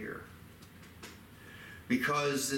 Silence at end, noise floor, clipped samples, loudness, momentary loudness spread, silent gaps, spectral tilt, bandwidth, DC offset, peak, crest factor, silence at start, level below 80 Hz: 0 s; -53 dBFS; under 0.1%; -32 LUFS; 23 LU; none; -3.5 dB/octave; 17 kHz; under 0.1%; -18 dBFS; 18 dB; 0 s; -64 dBFS